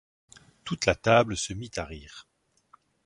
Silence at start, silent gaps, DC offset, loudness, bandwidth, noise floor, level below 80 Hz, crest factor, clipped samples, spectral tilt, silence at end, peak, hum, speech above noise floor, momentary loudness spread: 0.65 s; none; under 0.1%; -26 LUFS; 11.5 kHz; -62 dBFS; -50 dBFS; 24 dB; under 0.1%; -4 dB/octave; 0.85 s; -6 dBFS; none; 35 dB; 22 LU